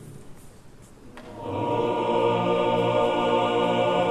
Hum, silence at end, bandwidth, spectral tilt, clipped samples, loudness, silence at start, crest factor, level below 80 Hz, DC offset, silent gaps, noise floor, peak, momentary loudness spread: none; 0 s; 12.5 kHz; -6.5 dB/octave; under 0.1%; -23 LUFS; 0 s; 14 dB; -52 dBFS; under 0.1%; none; -47 dBFS; -10 dBFS; 8 LU